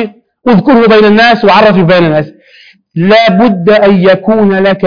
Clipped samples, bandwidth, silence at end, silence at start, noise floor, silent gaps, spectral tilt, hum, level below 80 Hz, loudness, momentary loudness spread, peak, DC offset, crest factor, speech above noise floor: 0.9%; 5.4 kHz; 0 s; 0 s; -40 dBFS; none; -7.5 dB/octave; none; -42 dBFS; -6 LUFS; 9 LU; 0 dBFS; 1%; 6 dB; 35 dB